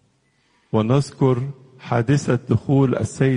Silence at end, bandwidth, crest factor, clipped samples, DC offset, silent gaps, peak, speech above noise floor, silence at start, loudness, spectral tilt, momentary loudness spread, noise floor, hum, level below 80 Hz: 0 s; 10.5 kHz; 16 dB; under 0.1%; under 0.1%; none; -4 dBFS; 44 dB; 0.75 s; -20 LUFS; -7.5 dB/octave; 7 LU; -63 dBFS; none; -52 dBFS